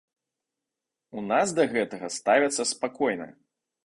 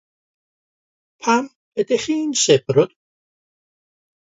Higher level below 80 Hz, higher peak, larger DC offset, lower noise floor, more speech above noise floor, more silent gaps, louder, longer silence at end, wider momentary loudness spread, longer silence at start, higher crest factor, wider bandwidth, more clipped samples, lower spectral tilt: second, -70 dBFS vs -64 dBFS; second, -6 dBFS vs 0 dBFS; neither; about the same, -87 dBFS vs under -90 dBFS; second, 61 dB vs over 72 dB; second, none vs 1.56-1.72 s; second, -26 LUFS vs -19 LUFS; second, 0.55 s vs 1.35 s; first, 14 LU vs 10 LU; about the same, 1.15 s vs 1.25 s; about the same, 22 dB vs 22 dB; first, 11.5 kHz vs 8 kHz; neither; about the same, -3 dB/octave vs -4 dB/octave